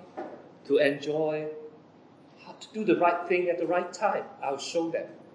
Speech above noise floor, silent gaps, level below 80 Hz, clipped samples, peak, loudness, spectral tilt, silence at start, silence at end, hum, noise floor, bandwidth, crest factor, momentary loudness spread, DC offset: 27 dB; none; -88 dBFS; under 0.1%; -10 dBFS; -28 LUFS; -5 dB/octave; 0 s; 0.05 s; none; -55 dBFS; 10.5 kHz; 20 dB; 19 LU; under 0.1%